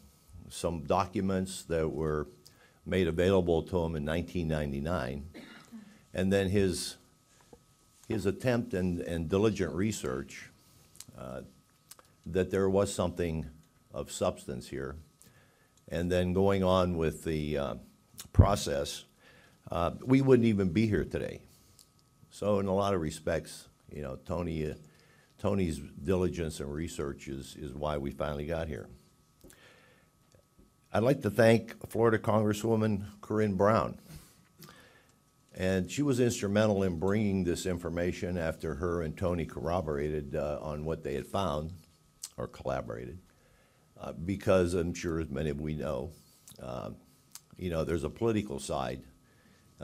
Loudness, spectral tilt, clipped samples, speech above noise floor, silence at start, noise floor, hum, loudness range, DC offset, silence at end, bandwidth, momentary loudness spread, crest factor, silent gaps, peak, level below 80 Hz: -32 LUFS; -6.5 dB/octave; under 0.1%; 35 dB; 0.3 s; -66 dBFS; none; 7 LU; under 0.1%; 0 s; 16 kHz; 18 LU; 26 dB; none; -8 dBFS; -48 dBFS